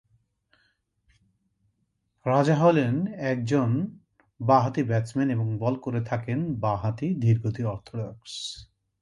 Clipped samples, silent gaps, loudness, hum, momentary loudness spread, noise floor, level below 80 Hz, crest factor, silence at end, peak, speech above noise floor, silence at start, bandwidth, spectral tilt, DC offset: under 0.1%; none; -26 LUFS; none; 14 LU; -74 dBFS; -58 dBFS; 20 dB; 0.35 s; -6 dBFS; 50 dB; 2.25 s; 11 kHz; -7.5 dB/octave; under 0.1%